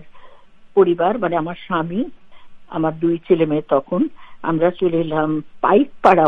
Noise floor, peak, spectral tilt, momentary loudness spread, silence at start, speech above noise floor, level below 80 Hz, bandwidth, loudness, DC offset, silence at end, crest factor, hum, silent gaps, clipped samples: -41 dBFS; 0 dBFS; -9 dB/octave; 8 LU; 0 s; 24 dB; -52 dBFS; 6 kHz; -19 LUFS; under 0.1%; 0 s; 18 dB; none; none; under 0.1%